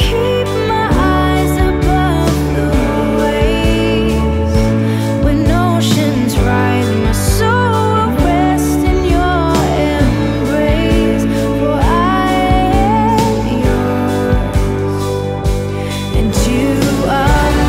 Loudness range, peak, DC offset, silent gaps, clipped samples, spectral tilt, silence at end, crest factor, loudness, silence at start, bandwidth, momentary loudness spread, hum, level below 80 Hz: 2 LU; 0 dBFS; under 0.1%; none; under 0.1%; -6 dB/octave; 0 s; 12 dB; -13 LUFS; 0 s; 16 kHz; 3 LU; none; -20 dBFS